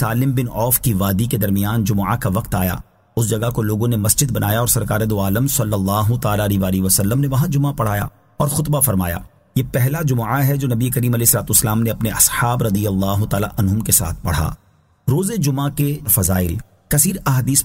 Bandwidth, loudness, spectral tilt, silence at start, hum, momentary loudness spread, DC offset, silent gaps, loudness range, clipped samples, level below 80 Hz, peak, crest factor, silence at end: 16.5 kHz; -17 LUFS; -5 dB/octave; 0 s; none; 7 LU; under 0.1%; none; 3 LU; under 0.1%; -36 dBFS; 0 dBFS; 18 dB; 0 s